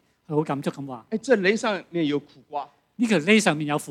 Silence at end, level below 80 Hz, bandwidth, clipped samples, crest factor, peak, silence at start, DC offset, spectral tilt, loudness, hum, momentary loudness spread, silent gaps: 0 s; -72 dBFS; 14.5 kHz; under 0.1%; 18 dB; -6 dBFS; 0.3 s; under 0.1%; -5 dB/octave; -23 LUFS; none; 16 LU; none